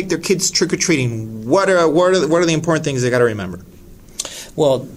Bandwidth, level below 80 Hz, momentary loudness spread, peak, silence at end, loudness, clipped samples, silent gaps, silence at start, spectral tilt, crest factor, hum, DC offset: 16 kHz; -48 dBFS; 13 LU; 0 dBFS; 0 s; -16 LUFS; under 0.1%; none; 0 s; -4.5 dB/octave; 16 dB; none; under 0.1%